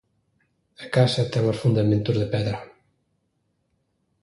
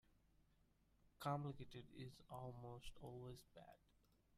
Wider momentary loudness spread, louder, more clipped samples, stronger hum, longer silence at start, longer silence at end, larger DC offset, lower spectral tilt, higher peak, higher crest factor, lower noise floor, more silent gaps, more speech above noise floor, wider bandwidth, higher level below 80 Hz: second, 9 LU vs 16 LU; first, -23 LUFS vs -54 LUFS; neither; second, none vs 50 Hz at -75 dBFS; first, 0.8 s vs 0.1 s; first, 1.6 s vs 0 s; neither; about the same, -7 dB/octave vs -6.5 dB/octave; first, -6 dBFS vs -34 dBFS; about the same, 20 dB vs 22 dB; second, -72 dBFS vs -79 dBFS; neither; first, 50 dB vs 25 dB; second, 11.5 kHz vs 15 kHz; first, -52 dBFS vs -72 dBFS